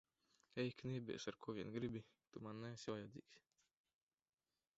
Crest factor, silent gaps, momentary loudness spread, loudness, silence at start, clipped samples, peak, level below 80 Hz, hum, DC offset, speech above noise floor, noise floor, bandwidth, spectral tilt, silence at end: 20 dB; none; 10 LU; -50 LUFS; 0.55 s; under 0.1%; -32 dBFS; -78 dBFS; none; under 0.1%; 31 dB; -80 dBFS; 7.6 kHz; -5.5 dB/octave; 1.4 s